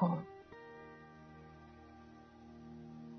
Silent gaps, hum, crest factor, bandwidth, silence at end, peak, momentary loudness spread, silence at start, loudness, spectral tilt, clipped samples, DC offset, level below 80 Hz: none; none; 24 dB; 6 kHz; 0 s; -20 dBFS; 12 LU; 0 s; -49 LUFS; -8.5 dB/octave; under 0.1%; under 0.1%; -70 dBFS